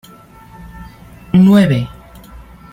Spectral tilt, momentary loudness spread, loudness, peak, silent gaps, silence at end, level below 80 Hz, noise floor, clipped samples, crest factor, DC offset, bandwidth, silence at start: -8 dB/octave; 26 LU; -11 LUFS; -2 dBFS; none; 0.35 s; -40 dBFS; -40 dBFS; under 0.1%; 14 dB; under 0.1%; 12.5 kHz; 0.6 s